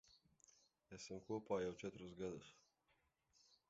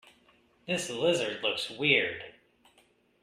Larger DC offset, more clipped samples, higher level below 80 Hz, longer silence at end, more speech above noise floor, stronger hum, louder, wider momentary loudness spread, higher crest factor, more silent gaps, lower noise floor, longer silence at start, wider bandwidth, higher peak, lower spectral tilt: neither; neither; second, -78 dBFS vs -72 dBFS; second, 0.15 s vs 0.9 s; about the same, 35 dB vs 37 dB; neither; second, -49 LUFS vs -28 LUFS; second, 14 LU vs 19 LU; about the same, 22 dB vs 22 dB; neither; first, -84 dBFS vs -66 dBFS; second, 0.1 s vs 0.65 s; second, 7.6 kHz vs 14.5 kHz; second, -30 dBFS vs -10 dBFS; first, -5.5 dB/octave vs -3 dB/octave